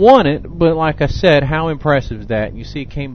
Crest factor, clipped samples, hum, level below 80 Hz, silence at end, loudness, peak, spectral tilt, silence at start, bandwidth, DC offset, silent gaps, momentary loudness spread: 14 dB; 0.2%; none; -30 dBFS; 0 s; -15 LUFS; 0 dBFS; -7.5 dB/octave; 0 s; 6.6 kHz; 1%; none; 13 LU